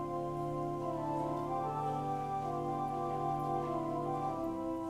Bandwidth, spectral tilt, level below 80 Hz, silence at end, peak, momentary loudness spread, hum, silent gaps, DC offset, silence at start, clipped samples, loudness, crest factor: 15 kHz; -8 dB/octave; -58 dBFS; 0 s; -24 dBFS; 2 LU; none; none; under 0.1%; 0 s; under 0.1%; -37 LUFS; 12 dB